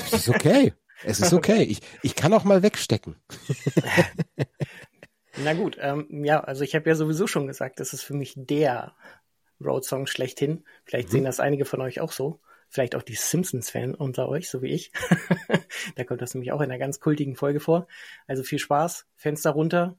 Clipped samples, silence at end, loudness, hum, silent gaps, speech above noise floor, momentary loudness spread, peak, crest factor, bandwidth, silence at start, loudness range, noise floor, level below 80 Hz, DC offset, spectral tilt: under 0.1%; 0.05 s; -25 LUFS; none; none; 30 dB; 13 LU; -4 dBFS; 20 dB; 16.5 kHz; 0 s; 6 LU; -54 dBFS; -60 dBFS; under 0.1%; -5 dB/octave